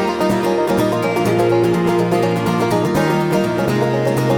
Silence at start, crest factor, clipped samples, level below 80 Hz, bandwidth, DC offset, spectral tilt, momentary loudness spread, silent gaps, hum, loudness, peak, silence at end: 0 s; 12 dB; under 0.1%; -46 dBFS; 19 kHz; under 0.1%; -6.5 dB/octave; 2 LU; none; none; -16 LUFS; -4 dBFS; 0 s